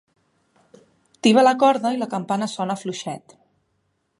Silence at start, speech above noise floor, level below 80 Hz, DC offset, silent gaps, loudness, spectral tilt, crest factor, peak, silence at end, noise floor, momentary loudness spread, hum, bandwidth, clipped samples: 1.25 s; 51 dB; -76 dBFS; under 0.1%; none; -20 LUFS; -5 dB/octave; 20 dB; -2 dBFS; 1 s; -70 dBFS; 15 LU; none; 11.5 kHz; under 0.1%